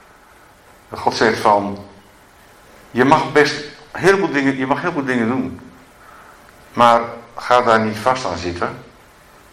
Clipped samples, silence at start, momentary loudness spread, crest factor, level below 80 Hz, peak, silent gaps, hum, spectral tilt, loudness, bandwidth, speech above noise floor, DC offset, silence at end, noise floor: under 0.1%; 0.9 s; 16 LU; 18 dB; -52 dBFS; 0 dBFS; none; none; -5 dB/octave; -17 LUFS; 16 kHz; 31 dB; under 0.1%; 0.7 s; -47 dBFS